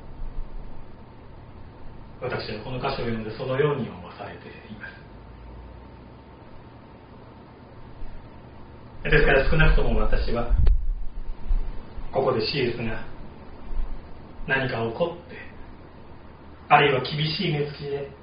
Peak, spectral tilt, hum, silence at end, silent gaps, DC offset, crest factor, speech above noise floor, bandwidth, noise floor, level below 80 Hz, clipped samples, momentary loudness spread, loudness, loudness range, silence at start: -2 dBFS; -4 dB/octave; none; 0 s; none; under 0.1%; 22 dB; 23 dB; 5.2 kHz; -46 dBFS; -30 dBFS; under 0.1%; 25 LU; -25 LUFS; 20 LU; 0 s